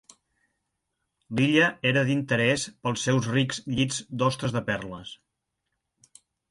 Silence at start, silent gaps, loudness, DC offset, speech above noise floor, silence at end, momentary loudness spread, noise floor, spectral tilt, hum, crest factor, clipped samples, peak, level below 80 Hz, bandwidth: 1.3 s; none; -25 LUFS; under 0.1%; 56 dB; 1.35 s; 11 LU; -81 dBFS; -5 dB/octave; none; 22 dB; under 0.1%; -6 dBFS; -58 dBFS; 11.5 kHz